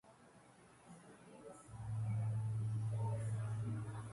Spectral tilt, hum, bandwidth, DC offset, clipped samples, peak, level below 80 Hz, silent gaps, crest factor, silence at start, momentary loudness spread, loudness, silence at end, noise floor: -7.5 dB/octave; none; 11.5 kHz; under 0.1%; under 0.1%; -32 dBFS; -66 dBFS; none; 10 dB; 0.05 s; 20 LU; -42 LUFS; 0 s; -64 dBFS